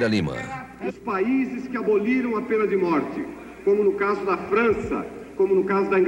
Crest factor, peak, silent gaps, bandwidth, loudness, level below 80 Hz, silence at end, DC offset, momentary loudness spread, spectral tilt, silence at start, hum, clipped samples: 14 dB; -10 dBFS; none; 10.5 kHz; -23 LUFS; -52 dBFS; 0 s; under 0.1%; 11 LU; -7 dB/octave; 0 s; none; under 0.1%